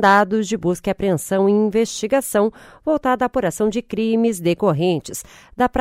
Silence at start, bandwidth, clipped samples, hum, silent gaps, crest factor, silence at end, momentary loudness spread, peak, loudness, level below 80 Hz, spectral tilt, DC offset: 0 s; 16 kHz; under 0.1%; none; none; 16 dB; 0 s; 6 LU; -4 dBFS; -19 LUFS; -46 dBFS; -5.5 dB/octave; under 0.1%